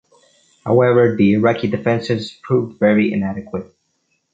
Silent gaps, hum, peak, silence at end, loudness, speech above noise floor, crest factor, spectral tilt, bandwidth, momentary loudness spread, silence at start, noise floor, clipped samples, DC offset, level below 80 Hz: none; none; -2 dBFS; 0.7 s; -17 LUFS; 51 dB; 16 dB; -8 dB/octave; 7.8 kHz; 13 LU; 0.65 s; -67 dBFS; under 0.1%; under 0.1%; -52 dBFS